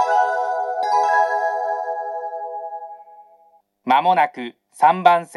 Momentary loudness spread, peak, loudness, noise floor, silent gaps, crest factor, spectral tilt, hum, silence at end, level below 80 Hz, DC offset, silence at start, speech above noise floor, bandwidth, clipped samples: 18 LU; 0 dBFS; -19 LUFS; -56 dBFS; none; 20 dB; -4.5 dB/octave; none; 0 s; -84 dBFS; under 0.1%; 0 s; 39 dB; 12.5 kHz; under 0.1%